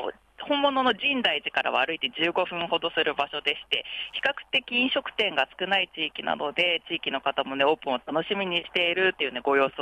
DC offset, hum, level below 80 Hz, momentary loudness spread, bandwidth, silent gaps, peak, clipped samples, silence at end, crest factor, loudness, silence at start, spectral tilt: under 0.1%; none; -66 dBFS; 5 LU; 11.5 kHz; none; -10 dBFS; under 0.1%; 0 s; 16 dB; -25 LUFS; 0 s; -4.5 dB/octave